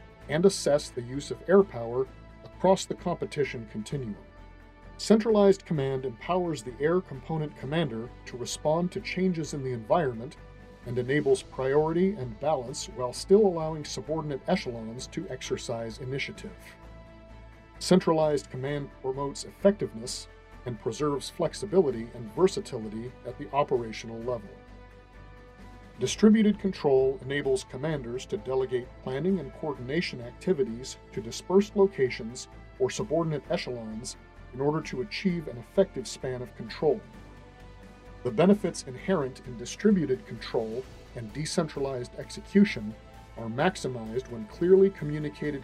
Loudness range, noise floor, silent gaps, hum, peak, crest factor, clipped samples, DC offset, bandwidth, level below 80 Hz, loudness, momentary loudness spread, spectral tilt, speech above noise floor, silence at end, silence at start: 5 LU; -49 dBFS; none; none; -6 dBFS; 22 dB; under 0.1%; under 0.1%; 12.5 kHz; -52 dBFS; -29 LUFS; 16 LU; -6 dB/octave; 21 dB; 0 s; 0 s